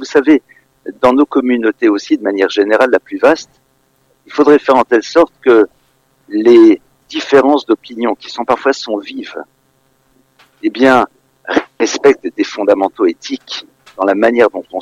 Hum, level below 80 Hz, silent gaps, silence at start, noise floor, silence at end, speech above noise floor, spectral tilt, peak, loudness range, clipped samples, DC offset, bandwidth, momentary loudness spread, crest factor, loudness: none; -56 dBFS; none; 0 s; -57 dBFS; 0 s; 45 dB; -4.5 dB/octave; 0 dBFS; 6 LU; under 0.1%; under 0.1%; 9.2 kHz; 13 LU; 12 dB; -12 LUFS